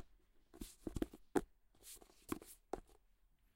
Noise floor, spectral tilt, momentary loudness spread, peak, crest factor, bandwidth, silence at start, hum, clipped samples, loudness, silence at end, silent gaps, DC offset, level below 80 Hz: -74 dBFS; -5.5 dB/octave; 20 LU; -22 dBFS; 28 dB; 16 kHz; 0 s; none; under 0.1%; -48 LUFS; 0.6 s; none; under 0.1%; -60 dBFS